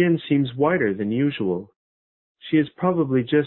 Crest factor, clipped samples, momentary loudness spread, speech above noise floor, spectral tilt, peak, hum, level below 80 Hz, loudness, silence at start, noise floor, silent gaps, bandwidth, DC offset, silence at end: 14 dB; under 0.1%; 6 LU; over 69 dB; -12 dB/octave; -8 dBFS; none; -60 dBFS; -22 LUFS; 0 s; under -90 dBFS; 1.76-2.35 s; 4.2 kHz; under 0.1%; 0 s